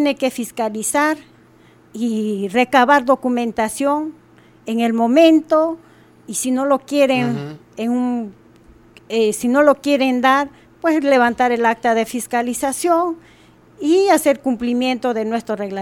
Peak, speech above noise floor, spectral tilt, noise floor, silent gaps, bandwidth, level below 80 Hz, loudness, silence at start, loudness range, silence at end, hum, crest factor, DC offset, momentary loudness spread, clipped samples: 0 dBFS; 32 dB; -4 dB/octave; -49 dBFS; none; 17.5 kHz; -58 dBFS; -17 LUFS; 0 s; 3 LU; 0 s; none; 16 dB; under 0.1%; 11 LU; under 0.1%